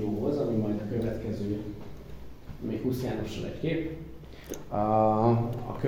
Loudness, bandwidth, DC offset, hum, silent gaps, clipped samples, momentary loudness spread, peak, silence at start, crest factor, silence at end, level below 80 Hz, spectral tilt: -30 LUFS; 17.5 kHz; under 0.1%; none; none; under 0.1%; 21 LU; -12 dBFS; 0 s; 18 dB; 0 s; -48 dBFS; -8 dB/octave